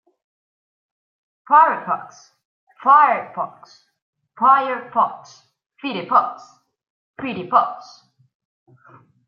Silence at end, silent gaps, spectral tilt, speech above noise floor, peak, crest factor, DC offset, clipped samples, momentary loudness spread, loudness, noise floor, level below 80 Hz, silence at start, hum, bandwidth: 1.45 s; 2.45-2.67 s, 4.02-4.13 s, 5.66-5.70 s, 6.90-7.14 s; -5 dB/octave; over 71 dB; -2 dBFS; 20 dB; under 0.1%; under 0.1%; 17 LU; -18 LUFS; under -90 dBFS; -76 dBFS; 1.5 s; none; 7 kHz